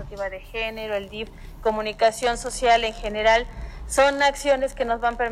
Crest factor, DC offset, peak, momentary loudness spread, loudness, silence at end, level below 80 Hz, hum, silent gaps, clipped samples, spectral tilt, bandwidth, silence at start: 18 dB; under 0.1%; -6 dBFS; 13 LU; -23 LUFS; 0 s; -40 dBFS; none; none; under 0.1%; -2.5 dB/octave; 15.5 kHz; 0 s